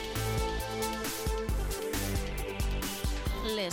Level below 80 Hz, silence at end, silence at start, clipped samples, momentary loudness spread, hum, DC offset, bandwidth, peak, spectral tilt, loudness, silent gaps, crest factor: -36 dBFS; 0 s; 0 s; under 0.1%; 2 LU; none; under 0.1%; 17 kHz; -20 dBFS; -4 dB/octave; -34 LUFS; none; 12 dB